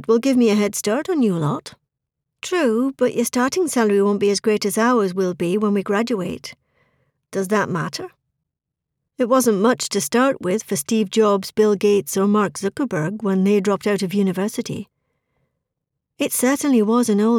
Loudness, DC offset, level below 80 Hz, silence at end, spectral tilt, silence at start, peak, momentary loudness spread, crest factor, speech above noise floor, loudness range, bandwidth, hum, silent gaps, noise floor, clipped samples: -19 LUFS; under 0.1%; -64 dBFS; 0 s; -5 dB/octave; 0 s; -4 dBFS; 9 LU; 14 dB; 63 dB; 4 LU; 18 kHz; none; none; -82 dBFS; under 0.1%